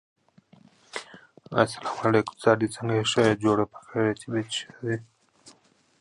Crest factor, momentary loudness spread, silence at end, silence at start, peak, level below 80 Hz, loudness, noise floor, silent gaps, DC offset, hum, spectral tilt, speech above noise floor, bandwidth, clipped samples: 24 dB; 12 LU; 0.5 s; 0.95 s; -4 dBFS; -62 dBFS; -26 LUFS; -61 dBFS; none; under 0.1%; none; -5 dB/octave; 36 dB; 11.5 kHz; under 0.1%